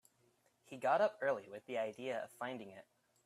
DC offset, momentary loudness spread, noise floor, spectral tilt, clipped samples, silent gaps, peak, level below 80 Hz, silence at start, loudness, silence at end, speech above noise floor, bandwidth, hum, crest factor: under 0.1%; 15 LU; -76 dBFS; -5 dB/octave; under 0.1%; none; -22 dBFS; -90 dBFS; 0.7 s; -39 LUFS; 0.45 s; 36 dB; 14 kHz; none; 20 dB